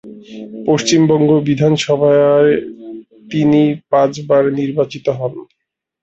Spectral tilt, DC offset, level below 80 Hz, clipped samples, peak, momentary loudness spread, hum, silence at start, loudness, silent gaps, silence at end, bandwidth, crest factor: -6 dB/octave; under 0.1%; -54 dBFS; under 0.1%; -2 dBFS; 21 LU; none; 0.05 s; -14 LUFS; none; 0.6 s; 8.2 kHz; 14 dB